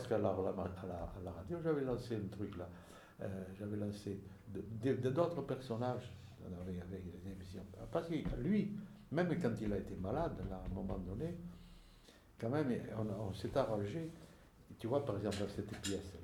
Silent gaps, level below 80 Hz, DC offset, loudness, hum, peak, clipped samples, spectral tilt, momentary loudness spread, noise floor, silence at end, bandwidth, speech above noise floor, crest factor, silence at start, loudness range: none; -58 dBFS; under 0.1%; -41 LUFS; none; -20 dBFS; under 0.1%; -7 dB/octave; 13 LU; -63 dBFS; 0 s; 18 kHz; 22 dB; 20 dB; 0 s; 3 LU